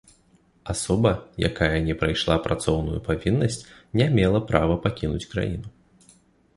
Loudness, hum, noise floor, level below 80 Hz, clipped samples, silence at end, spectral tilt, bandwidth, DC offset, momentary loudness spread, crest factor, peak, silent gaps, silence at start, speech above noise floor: -24 LUFS; none; -60 dBFS; -38 dBFS; under 0.1%; 0.85 s; -6 dB/octave; 11.5 kHz; under 0.1%; 9 LU; 20 dB; -4 dBFS; none; 0.65 s; 37 dB